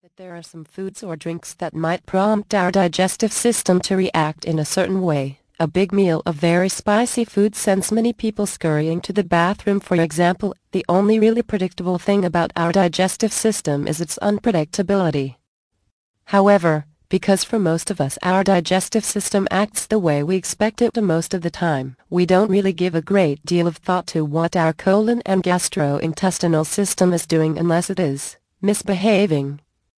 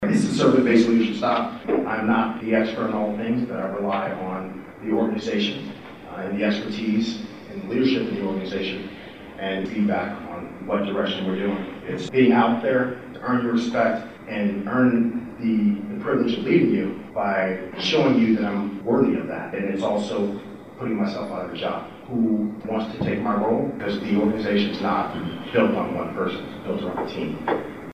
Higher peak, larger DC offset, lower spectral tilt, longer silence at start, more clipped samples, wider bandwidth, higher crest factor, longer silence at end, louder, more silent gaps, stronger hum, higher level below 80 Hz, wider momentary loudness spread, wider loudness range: about the same, -2 dBFS vs -4 dBFS; second, under 0.1% vs 0.2%; second, -5 dB/octave vs -6.5 dB/octave; first, 0.2 s vs 0 s; neither; first, 11 kHz vs 9.8 kHz; about the same, 16 dB vs 20 dB; first, 0.4 s vs 0 s; first, -19 LUFS vs -23 LUFS; first, 15.47-15.71 s, 15.92-16.14 s vs none; neither; about the same, -52 dBFS vs -56 dBFS; second, 8 LU vs 12 LU; second, 1 LU vs 5 LU